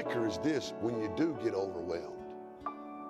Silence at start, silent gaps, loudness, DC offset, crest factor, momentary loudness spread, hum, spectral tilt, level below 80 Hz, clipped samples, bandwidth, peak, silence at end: 0 s; none; -36 LUFS; under 0.1%; 16 dB; 11 LU; none; -6 dB/octave; -68 dBFS; under 0.1%; 12.5 kHz; -20 dBFS; 0 s